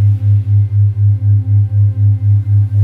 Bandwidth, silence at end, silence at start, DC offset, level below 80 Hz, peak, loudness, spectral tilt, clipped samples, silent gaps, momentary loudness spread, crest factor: 0.8 kHz; 0 s; 0 s; 0.2%; -42 dBFS; -4 dBFS; -12 LUFS; -11 dB/octave; under 0.1%; none; 2 LU; 6 dB